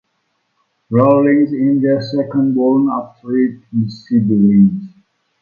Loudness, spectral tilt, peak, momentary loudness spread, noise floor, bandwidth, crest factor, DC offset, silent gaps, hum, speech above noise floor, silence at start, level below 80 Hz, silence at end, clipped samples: -14 LUFS; -10 dB/octave; 0 dBFS; 10 LU; -67 dBFS; 5 kHz; 14 dB; under 0.1%; none; none; 53 dB; 0.9 s; -54 dBFS; 0.55 s; under 0.1%